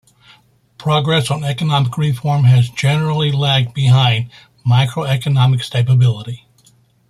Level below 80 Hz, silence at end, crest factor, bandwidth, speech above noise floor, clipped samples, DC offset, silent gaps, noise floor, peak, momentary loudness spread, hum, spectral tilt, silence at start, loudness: -50 dBFS; 0.75 s; 14 dB; 12 kHz; 39 dB; under 0.1%; under 0.1%; none; -53 dBFS; -2 dBFS; 9 LU; none; -6 dB/octave; 0.8 s; -15 LUFS